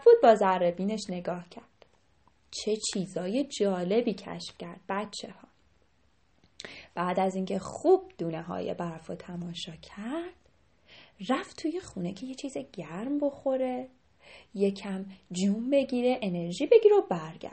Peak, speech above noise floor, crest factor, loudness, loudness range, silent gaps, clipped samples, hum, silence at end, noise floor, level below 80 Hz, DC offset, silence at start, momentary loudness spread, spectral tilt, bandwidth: -8 dBFS; 40 dB; 22 dB; -29 LUFS; 9 LU; none; under 0.1%; none; 0 s; -69 dBFS; -66 dBFS; under 0.1%; 0 s; 18 LU; -5.5 dB/octave; 8.8 kHz